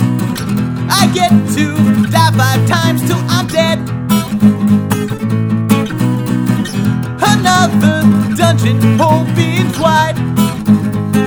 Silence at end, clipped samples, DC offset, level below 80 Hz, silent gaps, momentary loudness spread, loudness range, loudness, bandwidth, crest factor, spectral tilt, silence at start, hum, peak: 0 s; 0.1%; under 0.1%; -42 dBFS; none; 6 LU; 2 LU; -12 LUFS; over 20 kHz; 12 dB; -5.5 dB/octave; 0 s; none; 0 dBFS